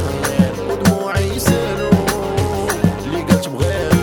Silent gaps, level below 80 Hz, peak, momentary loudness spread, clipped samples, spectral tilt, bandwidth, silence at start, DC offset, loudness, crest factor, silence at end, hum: none; -34 dBFS; 0 dBFS; 3 LU; under 0.1%; -5.5 dB/octave; 19 kHz; 0 s; under 0.1%; -17 LUFS; 16 dB; 0 s; none